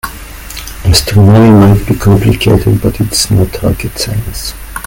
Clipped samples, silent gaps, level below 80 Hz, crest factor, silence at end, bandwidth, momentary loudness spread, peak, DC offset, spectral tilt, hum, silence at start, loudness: 2%; none; -24 dBFS; 8 dB; 0 s; 17.5 kHz; 18 LU; 0 dBFS; under 0.1%; -5.5 dB/octave; none; 0.05 s; -9 LUFS